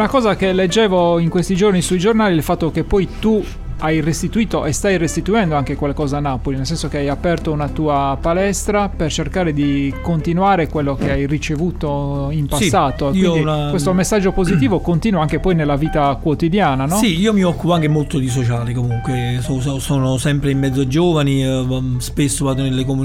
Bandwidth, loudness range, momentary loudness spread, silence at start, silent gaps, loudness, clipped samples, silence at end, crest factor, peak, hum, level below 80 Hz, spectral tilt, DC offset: 16.5 kHz; 3 LU; 5 LU; 0 s; none; -17 LUFS; under 0.1%; 0 s; 14 dB; -2 dBFS; none; -30 dBFS; -6 dB/octave; under 0.1%